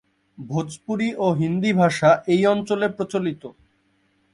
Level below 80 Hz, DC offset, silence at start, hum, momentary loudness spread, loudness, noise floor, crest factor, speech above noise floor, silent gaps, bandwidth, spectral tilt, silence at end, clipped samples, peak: -60 dBFS; under 0.1%; 0.4 s; none; 12 LU; -21 LUFS; -65 dBFS; 18 dB; 44 dB; none; 11.5 kHz; -6.5 dB/octave; 0.85 s; under 0.1%; -4 dBFS